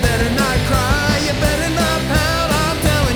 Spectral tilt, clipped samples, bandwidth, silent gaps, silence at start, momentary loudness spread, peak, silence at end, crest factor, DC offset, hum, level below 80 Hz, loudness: -4.5 dB/octave; under 0.1%; over 20 kHz; none; 0 s; 1 LU; -2 dBFS; 0 s; 14 dB; under 0.1%; none; -24 dBFS; -16 LUFS